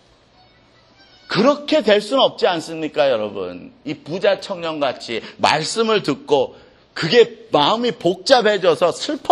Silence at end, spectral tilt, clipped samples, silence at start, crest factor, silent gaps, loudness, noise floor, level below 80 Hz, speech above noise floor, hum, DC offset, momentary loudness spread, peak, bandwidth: 0 s; -4 dB/octave; under 0.1%; 1.3 s; 18 dB; none; -18 LUFS; -52 dBFS; -62 dBFS; 35 dB; none; under 0.1%; 12 LU; 0 dBFS; 12 kHz